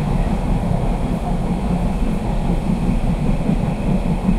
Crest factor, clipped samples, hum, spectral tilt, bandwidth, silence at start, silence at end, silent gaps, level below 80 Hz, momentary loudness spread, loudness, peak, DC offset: 12 dB; under 0.1%; none; -8 dB/octave; 12 kHz; 0 s; 0 s; none; -22 dBFS; 2 LU; -21 LUFS; -6 dBFS; under 0.1%